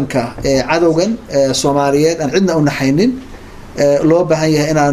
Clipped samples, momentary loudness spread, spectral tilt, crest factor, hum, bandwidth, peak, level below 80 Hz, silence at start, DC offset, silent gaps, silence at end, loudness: under 0.1%; 5 LU; -5.5 dB/octave; 12 dB; none; 14.5 kHz; 0 dBFS; -38 dBFS; 0 s; under 0.1%; none; 0 s; -13 LUFS